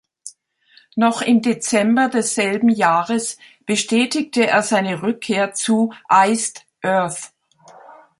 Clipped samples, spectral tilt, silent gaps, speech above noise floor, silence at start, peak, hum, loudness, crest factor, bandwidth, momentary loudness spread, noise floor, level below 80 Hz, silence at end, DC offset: under 0.1%; -3.5 dB/octave; none; 37 dB; 0.25 s; -2 dBFS; none; -18 LUFS; 18 dB; 11.5 kHz; 12 LU; -54 dBFS; -66 dBFS; 0.3 s; under 0.1%